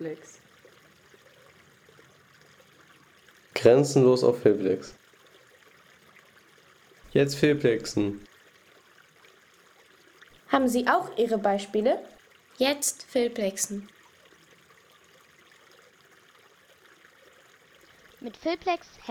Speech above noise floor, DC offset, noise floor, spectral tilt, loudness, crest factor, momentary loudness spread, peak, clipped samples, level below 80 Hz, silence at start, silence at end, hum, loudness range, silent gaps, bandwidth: 33 dB; under 0.1%; -58 dBFS; -4.5 dB/octave; -25 LUFS; 24 dB; 15 LU; -6 dBFS; under 0.1%; -66 dBFS; 0 s; 0 s; none; 11 LU; none; 18.5 kHz